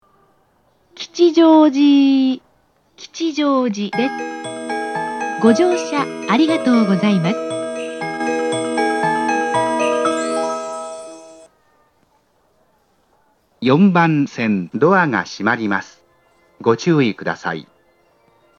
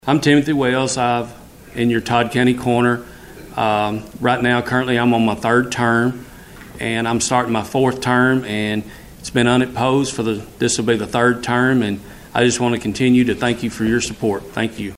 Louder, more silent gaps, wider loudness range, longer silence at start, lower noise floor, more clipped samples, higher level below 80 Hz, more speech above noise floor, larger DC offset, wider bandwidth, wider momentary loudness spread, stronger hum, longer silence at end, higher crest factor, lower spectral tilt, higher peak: about the same, -17 LUFS vs -18 LUFS; neither; first, 6 LU vs 1 LU; first, 0.95 s vs 0.05 s; first, -60 dBFS vs -38 dBFS; neither; second, -70 dBFS vs -46 dBFS; first, 45 dB vs 20 dB; neither; second, 11 kHz vs 15.5 kHz; first, 13 LU vs 8 LU; neither; first, 0.95 s vs 0 s; about the same, 18 dB vs 16 dB; about the same, -6 dB/octave vs -5 dB/octave; about the same, 0 dBFS vs -2 dBFS